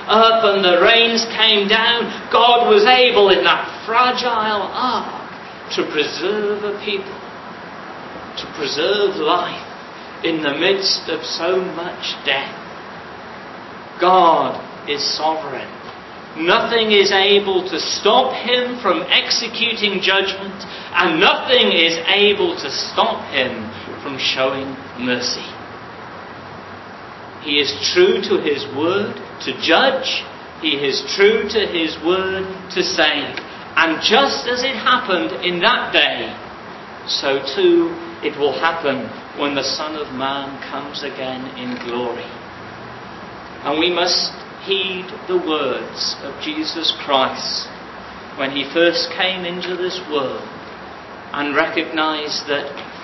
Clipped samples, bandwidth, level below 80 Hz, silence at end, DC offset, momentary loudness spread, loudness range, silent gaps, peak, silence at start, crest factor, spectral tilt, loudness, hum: under 0.1%; 6.2 kHz; -54 dBFS; 0 s; under 0.1%; 21 LU; 8 LU; none; 0 dBFS; 0 s; 18 dB; -3 dB/octave; -17 LUFS; none